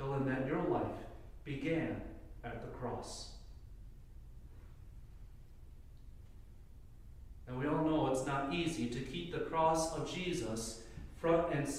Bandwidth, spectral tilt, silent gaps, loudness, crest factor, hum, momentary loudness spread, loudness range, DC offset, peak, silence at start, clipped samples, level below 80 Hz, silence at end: 15.5 kHz; -5.5 dB/octave; none; -37 LUFS; 20 dB; none; 25 LU; 22 LU; under 0.1%; -20 dBFS; 0 s; under 0.1%; -54 dBFS; 0 s